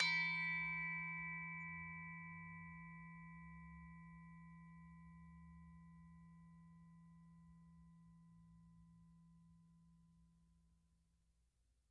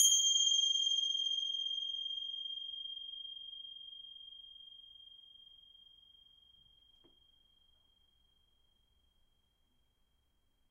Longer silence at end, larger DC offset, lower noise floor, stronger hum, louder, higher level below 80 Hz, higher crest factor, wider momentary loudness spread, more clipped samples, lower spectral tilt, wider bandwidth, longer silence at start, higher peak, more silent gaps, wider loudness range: second, 1.15 s vs 5.6 s; neither; first, -81 dBFS vs -76 dBFS; neither; second, -45 LUFS vs -33 LUFS; first, -72 dBFS vs -78 dBFS; about the same, 26 dB vs 24 dB; about the same, 26 LU vs 26 LU; neither; first, -3.5 dB/octave vs 5 dB/octave; second, 8.8 kHz vs 13 kHz; about the same, 0 s vs 0 s; second, -24 dBFS vs -14 dBFS; neither; second, 21 LU vs 25 LU